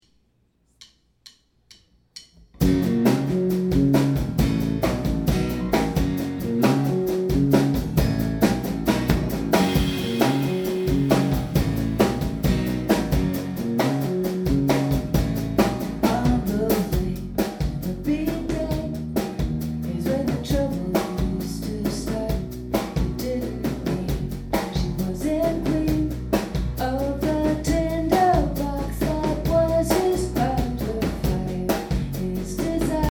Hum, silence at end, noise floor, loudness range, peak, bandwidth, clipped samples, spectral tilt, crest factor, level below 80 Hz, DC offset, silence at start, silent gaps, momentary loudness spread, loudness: none; 0 s; -65 dBFS; 4 LU; -4 dBFS; over 20 kHz; under 0.1%; -6.5 dB/octave; 20 dB; -32 dBFS; under 0.1%; 0.8 s; none; 7 LU; -23 LUFS